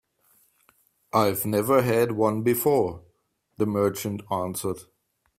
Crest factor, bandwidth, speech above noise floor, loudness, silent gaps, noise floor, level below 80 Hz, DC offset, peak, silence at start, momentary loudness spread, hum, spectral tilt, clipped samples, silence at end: 18 dB; 16 kHz; 46 dB; -24 LUFS; none; -69 dBFS; -60 dBFS; under 0.1%; -8 dBFS; 1.15 s; 10 LU; none; -5.5 dB/octave; under 0.1%; 0.55 s